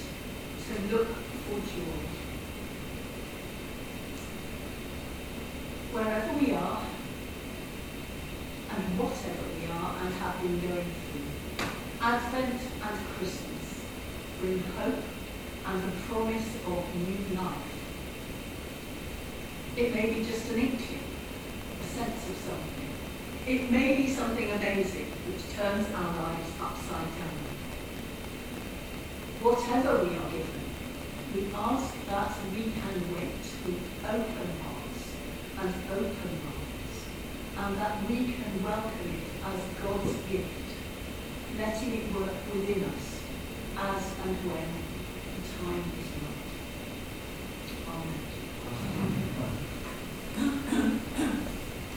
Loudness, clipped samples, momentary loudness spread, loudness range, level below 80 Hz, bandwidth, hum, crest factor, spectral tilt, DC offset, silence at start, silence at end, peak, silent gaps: -34 LUFS; under 0.1%; 10 LU; 6 LU; -46 dBFS; 17 kHz; none; 22 dB; -5.5 dB/octave; under 0.1%; 0 s; 0 s; -12 dBFS; none